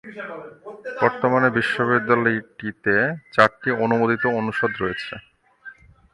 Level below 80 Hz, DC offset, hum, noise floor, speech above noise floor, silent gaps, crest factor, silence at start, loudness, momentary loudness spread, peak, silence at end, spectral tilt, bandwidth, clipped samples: -58 dBFS; under 0.1%; none; -45 dBFS; 24 dB; none; 22 dB; 0.05 s; -20 LUFS; 16 LU; 0 dBFS; 0.4 s; -7 dB/octave; 11.5 kHz; under 0.1%